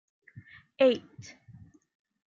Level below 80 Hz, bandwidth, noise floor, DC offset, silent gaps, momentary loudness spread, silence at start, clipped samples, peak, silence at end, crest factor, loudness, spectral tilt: -74 dBFS; 7.4 kHz; -54 dBFS; under 0.1%; none; 26 LU; 0.8 s; under 0.1%; -12 dBFS; 1.25 s; 20 dB; -27 LUFS; -5.5 dB/octave